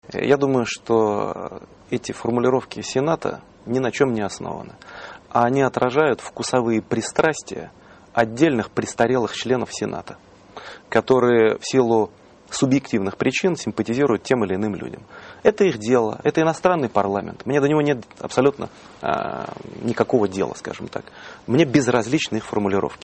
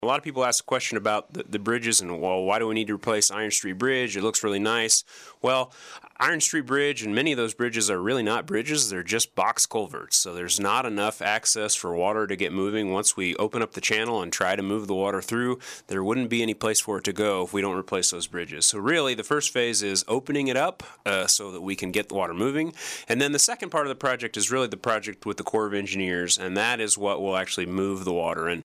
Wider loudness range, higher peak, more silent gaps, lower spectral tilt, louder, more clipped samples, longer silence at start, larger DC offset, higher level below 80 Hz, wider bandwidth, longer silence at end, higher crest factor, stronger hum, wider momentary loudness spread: about the same, 3 LU vs 2 LU; first, -4 dBFS vs -8 dBFS; neither; first, -5.5 dB/octave vs -2 dB/octave; first, -21 LUFS vs -25 LUFS; neither; about the same, 0.1 s vs 0 s; neither; first, -56 dBFS vs -66 dBFS; second, 8.8 kHz vs 15.5 kHz; about the same, 0.1 s vs 0 s; about the same, 18 dB vs 18 dB; neither; first, 16 LU vs 6 LU